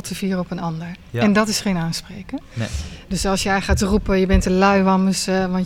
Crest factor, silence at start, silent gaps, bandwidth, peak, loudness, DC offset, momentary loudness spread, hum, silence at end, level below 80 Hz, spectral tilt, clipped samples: 18 dB; 0.05 s; none; 16 kHz; -2 dBFS; -19 LUFS; under 0.1%; 13 LU; none; 0 s; -30 dBFS; -5 dB/octave; under 0.1%